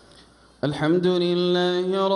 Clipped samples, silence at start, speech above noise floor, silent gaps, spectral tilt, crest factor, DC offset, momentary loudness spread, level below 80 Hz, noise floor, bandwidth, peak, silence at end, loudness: under 0.1%; 0.65 s; 31 dB; none; -7 dB/octave; 12 dB; under 0.1%; 7 LU; -60 dBFS; -52 dBFS; 10.5 kHz; -10 dBFS; 0 s; -22 LUFS